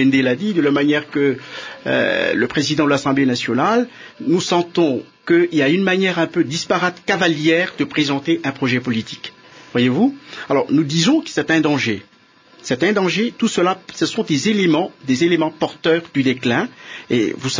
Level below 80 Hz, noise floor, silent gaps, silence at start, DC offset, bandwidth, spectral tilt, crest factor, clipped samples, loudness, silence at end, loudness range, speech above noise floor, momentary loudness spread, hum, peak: -60 dBFS; -49 dBFS; none; 0 s; under 0.1%; 7.6 kHz; -5 dB/octave; 14 dB; under 0.1%; -18 LUFS; 0 s; 2 LU; 32 dB; 8 LU; none; -4 dBFS